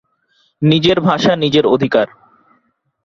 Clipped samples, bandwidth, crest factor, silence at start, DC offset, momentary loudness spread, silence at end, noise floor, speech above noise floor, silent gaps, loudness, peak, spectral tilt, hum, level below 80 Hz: under 0.1%; 7.4 kHz; 16 dB; 0.6 s; under 0.1%; 5 LU; 1 s; -61 dBFS; 48 dB; none; -14 LUFS; 0 dBFS; -6.5 dB/octave; none; -50 dBFS